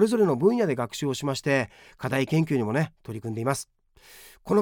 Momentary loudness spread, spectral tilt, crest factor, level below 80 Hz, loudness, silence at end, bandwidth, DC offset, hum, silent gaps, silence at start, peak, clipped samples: 14 LU; -6 dB/octave; 18 dB; -62 dBFS; -26 LUFS; 0 s; 19.5 kHz; under 0.1%; none; none; 0 s; -8 dBFS; under 0.1%